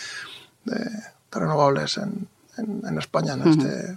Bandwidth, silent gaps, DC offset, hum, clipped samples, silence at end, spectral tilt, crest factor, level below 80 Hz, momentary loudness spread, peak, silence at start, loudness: 12.5 kHz; none; under 0.1%; none; under 0.1%; 0 s; -6 dB/octave; 20 dB; -64 dBFS; 17 LU; -4 dBFS; 0 s; -24 LUFS